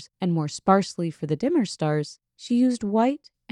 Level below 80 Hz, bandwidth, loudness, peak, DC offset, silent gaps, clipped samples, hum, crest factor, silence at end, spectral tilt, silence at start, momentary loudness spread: -64 dBFS; 11 kHz; -24 LUFS; -6 dBFS; under 0.1%; none; under 0.1%; none; 18 dB; 0.35 s; -6.5 dB/octave; 0 s; 9 LU